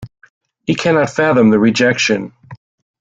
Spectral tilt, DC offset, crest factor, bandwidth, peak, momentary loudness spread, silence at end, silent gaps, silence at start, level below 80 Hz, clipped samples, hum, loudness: -5 dB/octave; under 0.1%; 14 dB; 7.8 kHz; -2 dBFS; 10 LU; 0.45 s; 0.30-0.41 s; 0 s; -52 dBFS; under 0.1%; none; -13 LUFS